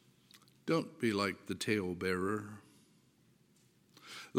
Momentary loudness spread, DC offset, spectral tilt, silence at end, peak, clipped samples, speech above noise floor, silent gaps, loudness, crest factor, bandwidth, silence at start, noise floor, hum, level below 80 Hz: 17 LU; under 0.1%; -5 dB/octave; 0 s; -18 dBFS; under 0.1%; 33 dB; none; -36 LUFS; 20 dB; 17 kHz; 0.35 s; -69 dBFS; none; -76 dBFS